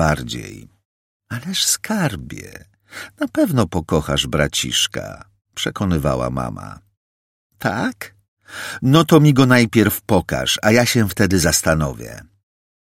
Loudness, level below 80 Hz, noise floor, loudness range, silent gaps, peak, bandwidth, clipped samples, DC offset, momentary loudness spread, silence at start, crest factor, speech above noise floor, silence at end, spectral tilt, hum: -17 LUFS; -38 dBFS; under -90 dBFS; 9 LU; 0.85-1.20 s, 6.97-7.50 s, 8.28-8.37 s; 0 dBFS; 16.5 kHz; under 0.1%; under 0.1%; 22 LU; 0 s; 18 dB; over 72 dB; 0.6 s; -4.5 dB/octave; none